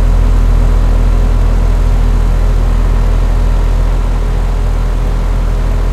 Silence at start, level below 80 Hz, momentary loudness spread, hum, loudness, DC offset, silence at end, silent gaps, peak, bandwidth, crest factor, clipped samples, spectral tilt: 0 s; -10 dBFS; 3 LU; none; -14 LUFS; under 0.1%; 0 s; none; 0 dBFS; 8.2 kHz; 8 dB; under 0.1%; -7 dB/octave